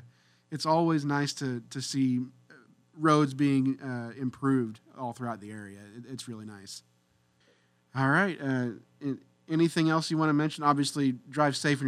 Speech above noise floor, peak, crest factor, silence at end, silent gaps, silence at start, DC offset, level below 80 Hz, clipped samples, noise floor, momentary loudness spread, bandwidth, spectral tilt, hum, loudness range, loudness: 40 dB; -10 dBFS; 20 dB; 0 s; none; 0.5 s; under 0.1%; -76 dBFS; under 0.1%; -69 dBFS; 17 LU; 14 kHz; -5.5 dB/octave; none; 8 LU; -29 LUFS